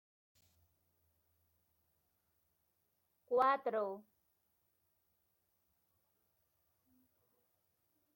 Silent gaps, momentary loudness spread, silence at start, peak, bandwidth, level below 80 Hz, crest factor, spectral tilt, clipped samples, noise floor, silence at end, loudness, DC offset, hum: none; 12 LU; 3.3 s; -20 dBFS; 16.5 kHz; under -90 dBFS; 24 dB; -5.5 dB/octave; under 0.1%; -82 dBFS; 4.15 s; -36 LUFS; under 0.1%; none